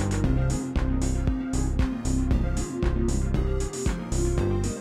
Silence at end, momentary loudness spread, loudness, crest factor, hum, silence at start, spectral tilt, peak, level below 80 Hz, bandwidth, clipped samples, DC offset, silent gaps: 0 s; 3 LU; -27 LUFS; 14 dB; none; 0 s; -6.5 dB/octave; -10 dBFS; -28 dBFS; 13 kHz; under 0.1%; under 0.1%; none